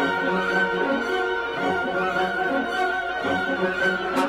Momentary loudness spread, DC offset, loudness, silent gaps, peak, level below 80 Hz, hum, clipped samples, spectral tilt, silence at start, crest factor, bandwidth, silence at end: 3 LU; under 0.1%; -23 LUFS; none; -10 dBFS; -54 dBFS; none; under 0.1%; -5 dB/octave; 0 s; 14 dB; 16 kHz; 0 s